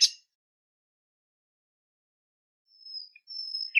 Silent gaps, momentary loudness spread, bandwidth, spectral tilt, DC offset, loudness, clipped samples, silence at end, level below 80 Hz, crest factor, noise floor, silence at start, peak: 0.35-2.65 s; 21 LU; 15.5 kHz; 11.5 dB/octave; under 0.1%; -32 LUFS; under 0.1%; 0 s; under -90 dBFS; 26 dB; under -90 dBFS; 0 s; -8 dBFS